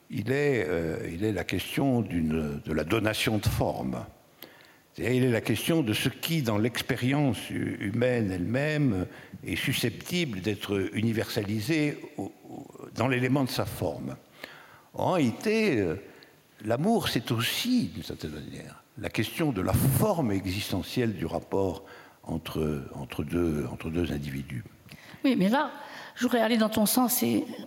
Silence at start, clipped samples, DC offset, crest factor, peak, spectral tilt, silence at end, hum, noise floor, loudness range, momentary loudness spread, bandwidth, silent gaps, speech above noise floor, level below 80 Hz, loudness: 0.1 s; under 0.1%; under 0.1%; 20 dB; -8 dBFS; -5.5 dB/octave; 0 s; none; -55 dBFS; 4 LU; 15 LU; 17 kHz; none; 27 dB; -54 dBFS; -28 LUFS